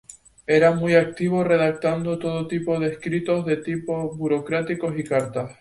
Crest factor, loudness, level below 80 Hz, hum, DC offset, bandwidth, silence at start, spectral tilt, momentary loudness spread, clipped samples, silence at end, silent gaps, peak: 18 dB; -22 LUFS; -56 dBFS; none; under 0.1%; 11.5 kHz; 0.1 s; -7 dB/octave; 9 LU; under 0.1%; 0.1 s; none; -4 dBFS